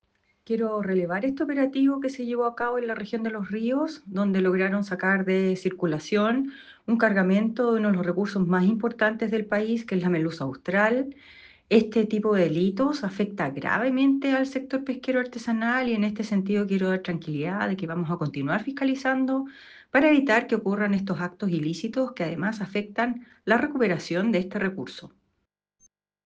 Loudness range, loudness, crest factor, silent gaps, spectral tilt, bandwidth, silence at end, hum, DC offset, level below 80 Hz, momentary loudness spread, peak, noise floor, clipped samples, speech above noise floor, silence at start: 3 LU; -25 LUFS; 18 dB; none; -7 dB/octave; 8.2 kHz; 1.15 s; none; under 0.1%; -66 dBFS; 7 LU; -6 dBFS; -78 dBFS; under 0.1%; 53 dB; 0.5 s